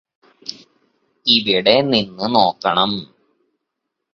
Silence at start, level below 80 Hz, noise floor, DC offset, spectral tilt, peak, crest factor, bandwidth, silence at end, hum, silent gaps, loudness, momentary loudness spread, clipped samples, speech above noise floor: 0.45 s; -58 dBFS; -78 dBFS; under 0.1%; -5 dB/octave; 0 dBFS; 20 dB; 7.2 kHz; 1.1 s; none; none; -16 LUFS; 19 LU; under 0.1%; 62 dB